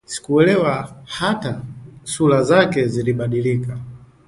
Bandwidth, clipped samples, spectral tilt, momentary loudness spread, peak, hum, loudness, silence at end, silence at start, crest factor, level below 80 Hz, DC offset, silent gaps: 11.5 kHz; under 0.1%; -6 dB/octave; 17 LU; 0 dBFS; none; -18 LUFS; 0.3 s; 0.1 s; 18 dB; -52 dBFS; under 0.1%; none